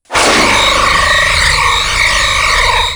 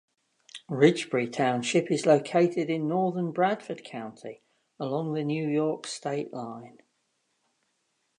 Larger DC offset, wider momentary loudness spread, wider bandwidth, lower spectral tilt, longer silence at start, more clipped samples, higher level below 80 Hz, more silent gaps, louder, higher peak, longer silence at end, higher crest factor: neither; second, 2 LU vs 17 LU; first, over 20 kHz vs 11 kHz; second, -1.5 dB/octave vs -5.5 dB/octave; second, 0.1 s vs 0.55 s; neither; first, -24 dBFS vs -80 dBFS; neither; first, -8 LUFS vs -27 LUFS; first, 0 dBFS vs -6 dBFS; second, 0 s vs 1.5 s; second, 10 dB vs 22 dB